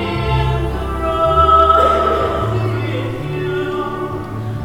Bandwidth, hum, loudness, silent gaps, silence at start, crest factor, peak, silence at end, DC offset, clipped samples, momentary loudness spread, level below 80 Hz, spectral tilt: 17 kHz; none; -16 LUFS; none; 0 s; 16 dB; 0 dBFS; 0 s; under 0.1%; under 0.1%; 12 LU; -26 dBFS; -7 dB/octave